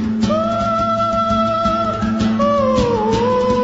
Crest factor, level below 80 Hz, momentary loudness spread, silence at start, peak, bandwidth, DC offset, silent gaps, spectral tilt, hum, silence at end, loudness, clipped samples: 12 dB; -36 dBFS; 2 LU; 0 s; -4 dBFS; 8 kHz; 0.3%; none; -6.5 dB/octave; none; 0 s; -16 LUFS; under 0.1%